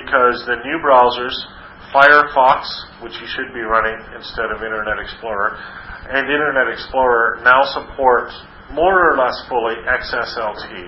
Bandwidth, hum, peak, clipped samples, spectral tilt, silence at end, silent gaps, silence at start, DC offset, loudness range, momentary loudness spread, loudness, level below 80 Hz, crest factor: 8 kHz; none; 0 dBFS; under 0.1%; -6 dB/octave; 0 s; none; 0 s; under 0.1%; 6 LU; 16 LU; -16 LUFS; -42 dBFS; 16 dB